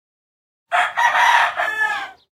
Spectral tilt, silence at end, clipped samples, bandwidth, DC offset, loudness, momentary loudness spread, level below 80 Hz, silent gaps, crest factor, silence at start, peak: 1 dB/octave; 0.2 s; under 0.1%; 16.5 kHz; under 0.1%; -17 LUFS; 8 LU; -68 dBFS; none; 18 dB; 0.7 s; -2 dBFS